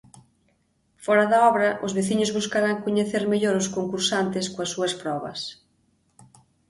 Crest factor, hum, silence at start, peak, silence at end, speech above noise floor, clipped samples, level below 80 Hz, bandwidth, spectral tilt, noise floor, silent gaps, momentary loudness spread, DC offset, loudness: 18 dB; none; 1 s; -6 dBFS; 1.15 s; 44 dB; under 0.1%; -64 dBFS; 11.5 kHz; -4 dB/octave; -67 dBFS; none; 11 LU; under 0.1%; -23 LUFS